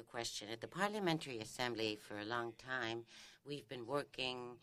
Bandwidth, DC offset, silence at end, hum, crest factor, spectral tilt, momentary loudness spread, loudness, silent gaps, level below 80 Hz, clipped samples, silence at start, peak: 15.5 kHz; under 0.1%; 0.05 s; none; 22 dB; -4 dB/octave; 9 LU; -43 LUFS; none; -74 dBFS; under 0.1%; 0 s; -20 dBFS